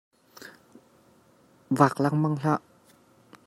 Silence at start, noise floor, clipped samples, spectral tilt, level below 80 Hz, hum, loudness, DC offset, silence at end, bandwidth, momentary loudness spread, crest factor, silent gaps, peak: 0.4 s; -60 dBFS; under 0.1%; -7.5 dB/octave; -72 dBFS; none; -25 LUFS; under 0.1%; 0.9 s; 15.5 kHz; 25 LU; 24 dB; none; -4 dBFS